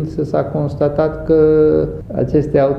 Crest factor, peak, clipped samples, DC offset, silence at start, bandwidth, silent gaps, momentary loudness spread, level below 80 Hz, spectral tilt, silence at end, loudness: 14 dB; 0 dBFS; under 0.1%; under 0.1%; 0 s; 6 kHz; none; 8 LU; -34 dBFS; -10 dB/octave; 0 s; -15 LUFS